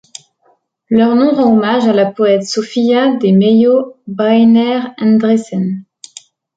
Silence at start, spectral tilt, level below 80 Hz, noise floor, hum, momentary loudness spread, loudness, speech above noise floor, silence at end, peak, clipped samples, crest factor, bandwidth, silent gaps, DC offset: 0.9 s; -6.5 dB/octave; -58 dBFS; -56 dBFS; none; 8 LU; -12 LUFS; 46 dB; 0.75 s; -2 dBFS; under 0.1%; 10 dB; 9 kHz; none; under 0.1%